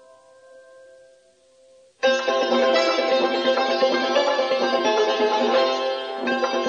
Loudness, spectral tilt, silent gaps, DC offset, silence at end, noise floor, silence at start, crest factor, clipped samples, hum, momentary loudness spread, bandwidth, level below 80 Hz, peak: -21 LUFS; -2 dB/octave; none; under 0.1%; 0 s; -56 dBFS; 0.55 s; 14 dB; under 0.1%; none; 5 LU; 7.8 kHz; -82 dBFS; -8 dBFS